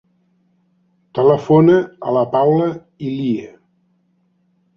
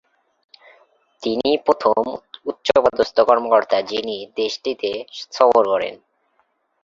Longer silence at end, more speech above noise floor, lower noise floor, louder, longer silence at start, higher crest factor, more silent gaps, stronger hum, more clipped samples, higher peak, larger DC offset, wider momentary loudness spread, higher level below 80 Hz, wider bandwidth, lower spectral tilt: first, 1.3 s vs 0.9 s; about the same, 47 dB vs 47 dB; second, -62 dBFS vs -66 dBFS; first, -16 LUFS vs -19 LUFS; about the same, 1.15 s vs 1.2 s; about the same, 16 dB vs 20 dB; neither; neither; neither; about the same, -2 dBFS vs 0 dBFS; neither; about the same, 14 LU vs 13 LU; about the same, -58 dBFS vs -60 dBFS; second, 6.8 kHz vs 7.6 kHz; first, -9 dB/octave vs -4 dB/octave